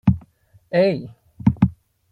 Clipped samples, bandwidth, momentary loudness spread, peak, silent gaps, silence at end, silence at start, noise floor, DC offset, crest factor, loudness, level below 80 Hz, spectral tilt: under 0.1%; 4.9 kHz; 11 LU; -2 dBFS; none; 0.4 s; 0.05 s; -53 dBFS; under 0.1%; 20 dB; -21 LUFS; -42 dBFS; -10 dB/octave